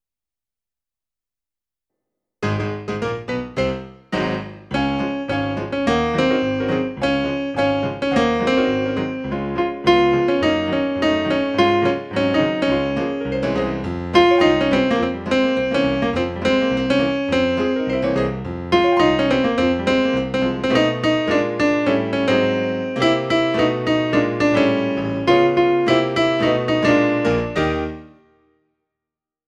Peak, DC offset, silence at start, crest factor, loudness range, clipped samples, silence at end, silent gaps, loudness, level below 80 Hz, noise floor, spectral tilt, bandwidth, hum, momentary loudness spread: -2 dBFS; under 0.1%; 2.4 s; 18 dB; 6 LU; under 0.1%; 1.4 s; none; -19 LUFS; -42 dBFS; under -90 dBFS; -6 dB/octave; 9.2 kHz; none; 8 LU